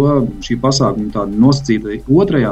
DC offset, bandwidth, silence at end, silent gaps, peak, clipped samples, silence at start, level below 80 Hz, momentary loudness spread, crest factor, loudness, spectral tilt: under 0.1%; 8.6 kHz; 0 s; none; 0 dBFS; under 0.1%; 0 s; -34 dBFS; 7 LU; 14 dB; -14 LUFS; -6.5 dB/octave